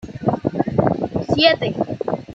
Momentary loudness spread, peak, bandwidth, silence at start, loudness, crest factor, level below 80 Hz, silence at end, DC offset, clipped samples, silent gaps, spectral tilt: 8 LU; -2 dBFS; 7.8 kHz; 0 s; -19 LUFS; 18 dB; -46 dBFS; 0 s; under 0.1%; under 0.1%; none; -7 dB/octave